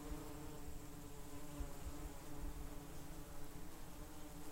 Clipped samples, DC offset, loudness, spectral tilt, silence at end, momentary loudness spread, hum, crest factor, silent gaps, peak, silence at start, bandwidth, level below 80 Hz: under 0.1%; under 0.1%; -54 LUFS; -5 dB/octave; 0 s; 4 LU; none; 14 dB; none; -34 dBFS; 0 s; 16 kHz; -54 dBFS